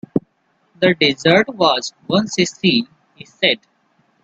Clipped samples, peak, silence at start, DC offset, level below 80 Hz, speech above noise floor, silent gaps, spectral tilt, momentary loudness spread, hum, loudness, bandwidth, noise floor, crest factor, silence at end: under 0.1%; 0 dBFS; 0.15 s; under 0.1%; -58 dBFS; 46 dB; none; -4.5 dB/octave; 10 LU; none; -17 LUFS; 8.2 kHz; -63 dBFS; 18 dB; 0.65 s